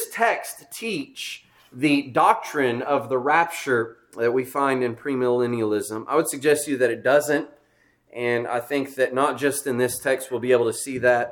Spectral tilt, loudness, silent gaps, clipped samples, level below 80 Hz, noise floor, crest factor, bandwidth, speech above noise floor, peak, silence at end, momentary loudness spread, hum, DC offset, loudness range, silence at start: -4 dB/octave; -23 LUFS; none; under 0.1%; -68 dBFS; -62 dBFS; 18 dB; 19 kHz; 40 dB; -4 dBFS; 0 s; 9 LU; none; under 0.1%; 2 LU; 0 s